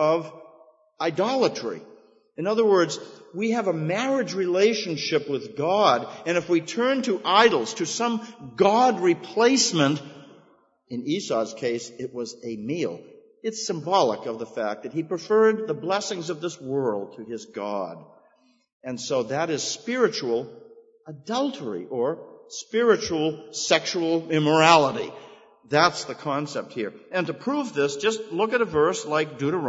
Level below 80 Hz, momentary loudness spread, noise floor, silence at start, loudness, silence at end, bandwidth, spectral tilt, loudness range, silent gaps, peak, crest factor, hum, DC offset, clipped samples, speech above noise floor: -68 dBFS; 14 LU; -62 dBFS; 0 s; -24 LUFS; 0 s; 8 kHz; -4 dB/octave; 7 LU; 18.72-18.80 s; 0 dBFS; 24 dB; none; under 0.1%; under 0.1%; 38 dB